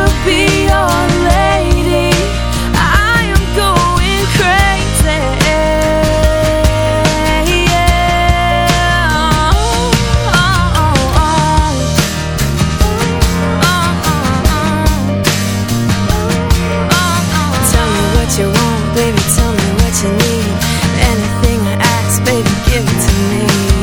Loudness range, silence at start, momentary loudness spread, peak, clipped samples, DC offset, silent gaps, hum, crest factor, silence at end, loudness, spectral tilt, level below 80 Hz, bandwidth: 2 LU; 0 s; 3 LU; 0 dBFS; 0.2%; under 0.1%; none; none; 10 dB; 0 s; -12 LUFS; -4.5 dB/octave; -18 dBFS; 20 kHz